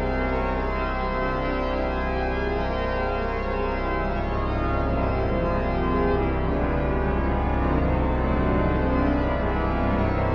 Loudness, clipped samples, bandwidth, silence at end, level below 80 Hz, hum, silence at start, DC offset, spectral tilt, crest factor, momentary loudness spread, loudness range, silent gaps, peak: -25 LUFS; under 0.1%; 6 kHz; 0 s; -28 dBFS; none; 0 s; under 0.1%; -9 dB/octave; 14 dB; 3 LU; 2 LU; none; -10 dBFS